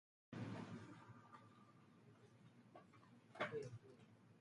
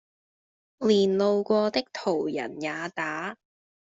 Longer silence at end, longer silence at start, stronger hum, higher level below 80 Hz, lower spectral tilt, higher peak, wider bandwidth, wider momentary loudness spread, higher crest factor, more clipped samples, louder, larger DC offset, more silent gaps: second, 0 s vs 0.6 s; second, 0.3 s vs 0.8 s; neither; second, -86 dBFS vs -70 dBFS; about the same, -6.5 dB/octave vs -5.5 dB/octave; second, -32 dBFS vs -10 dBFS; first, 11 kHz vs 7.8 kHz; first, 20 LU vs 10 LU; first, 24 dB vs 18 dB; neither; second, -54 LUFS vs -26 LUFS; neither; neither